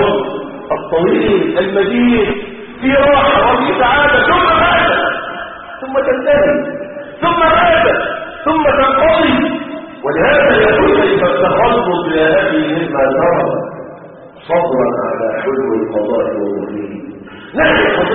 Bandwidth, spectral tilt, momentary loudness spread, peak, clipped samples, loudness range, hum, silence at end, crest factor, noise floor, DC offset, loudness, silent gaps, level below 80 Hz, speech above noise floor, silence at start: 4.3 kHz; -3 dB/octave; 14 LU; 0 dBFS; under 0.1%; 5 LU; none; 0 s; 12 dB; -34 dBFS; under 0.1%; -12 LUFS; none; -36 dBFS; 23 dB; 0 s